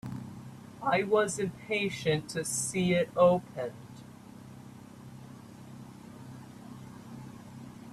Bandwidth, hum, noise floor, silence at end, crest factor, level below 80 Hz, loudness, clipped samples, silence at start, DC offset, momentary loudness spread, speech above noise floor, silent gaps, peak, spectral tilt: 14.5 kHz; none; -49 dBFS; 0 s; 20 dB; -66 dBFS; -30 LUFS; under 0.1%; 0.05 s; under 0.1%; 23 LU; 20 dB; none; -12 dBFS; -4.5 dB/octave